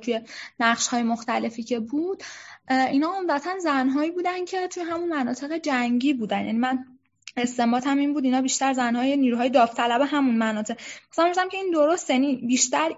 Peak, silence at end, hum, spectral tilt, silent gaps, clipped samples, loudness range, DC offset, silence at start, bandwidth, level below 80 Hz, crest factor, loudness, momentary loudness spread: -6 dBFS; 0 s; none; -3 dB/octave; none; under 0.1%; 3 LU; under 0.1%; 0 s; 8 kHz; -70 dBFS; 18 dB; -24 LUFS; 8 LU